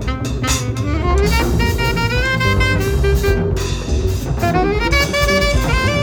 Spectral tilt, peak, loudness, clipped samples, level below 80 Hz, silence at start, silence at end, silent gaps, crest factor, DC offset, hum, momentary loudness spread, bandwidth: -5 dB/octave; -2 dBFS; -16 LUFS; under 0.1%; -20 dBFS; 0 s; 0 s; none; 14 dB; under 0.1%; none; 5 LU; over 20 kHz